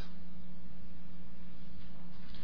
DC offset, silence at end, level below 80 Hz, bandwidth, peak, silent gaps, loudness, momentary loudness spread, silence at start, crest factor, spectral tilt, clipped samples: 4%; 0 s; -58 dBFS; 5.4 kHz; -26 dBFS; none; -54 LUFS; 2 LU; 0 s; 14 dB; -7.5 dB/octave; under 0.1%